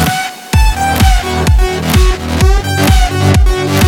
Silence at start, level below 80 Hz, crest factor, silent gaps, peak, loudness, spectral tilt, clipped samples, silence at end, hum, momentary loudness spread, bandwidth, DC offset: 0 s; -12 dBFS; 10 dB; none; 0 dBFS; -11 LUFS; -5 dB/octave; under 0.1%; 0 s; none; 3 LU; 17.5 kHz; under 0.1%